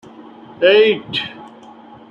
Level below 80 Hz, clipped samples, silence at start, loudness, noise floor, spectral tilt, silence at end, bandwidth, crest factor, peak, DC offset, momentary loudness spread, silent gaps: -64 dBFS; under 0.1%; 0.6 s; -15 LUFS; -40 dBFS; -5.5 dB/octave; 0.65 s; 6.8 kHz; 16 dB; -2 dBFS; under 0.1%; 12 LU; none